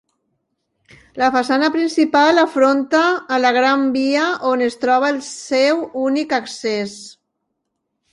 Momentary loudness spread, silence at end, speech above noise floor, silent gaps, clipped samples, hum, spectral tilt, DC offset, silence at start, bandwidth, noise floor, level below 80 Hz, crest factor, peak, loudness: 8 LU; 1 s; 58 dB; none; under 0.1%; none; -3 dB/octave; under 0.1%; 1.15 s; 11.5 kHz; -75 dBFS; -62 dBFS; 16 dB; -2 dBFS; -17 LUFS